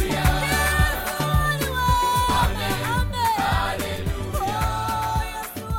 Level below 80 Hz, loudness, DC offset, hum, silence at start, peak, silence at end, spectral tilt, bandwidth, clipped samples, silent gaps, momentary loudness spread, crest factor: -30 dBFS; -23 LUFS; under 0.1%; none; 0 s; -6 dBFS; 0 s; -4 dB/octave; 17 kHz; under 0.1%; none; 7 LU; 16 dB